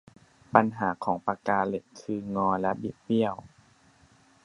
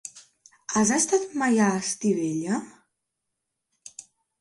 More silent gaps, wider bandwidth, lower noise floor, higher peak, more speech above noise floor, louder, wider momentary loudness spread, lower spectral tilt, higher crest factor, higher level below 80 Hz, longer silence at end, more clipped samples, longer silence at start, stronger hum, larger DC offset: neither; about the same, 10.5 kHz vs 11.5 kHz; second, -60 dBFS vs -82 dBFS; first, -2 dBFS vs -10 dBFS; second, 33 dB vs 58 dB; second, -28 LUFS vs -24 LUFS; second, 11 LU vs 22 LU; first, -7.5 dB/octave vs -4 dB/octave; first, 28 dB vs 18 dB; first, -62 dBFS vs -68 dBFS; first, 1 s vs 0.4 s; neither; first, 0.55 s vs 0.05 s; neither; neither